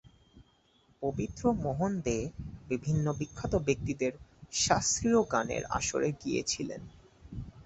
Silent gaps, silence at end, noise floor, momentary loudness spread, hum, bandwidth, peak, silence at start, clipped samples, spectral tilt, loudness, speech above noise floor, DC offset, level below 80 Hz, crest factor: none; 0.05 s; -67 dBFS; 13 LU; none; 8.4 kHz; -10 dBFS; 0.05 s; under 0.1%; -4.5 dB/octave; -31 LUFS; 36 dB; under 0.1%; -50 dBFS; 22 dB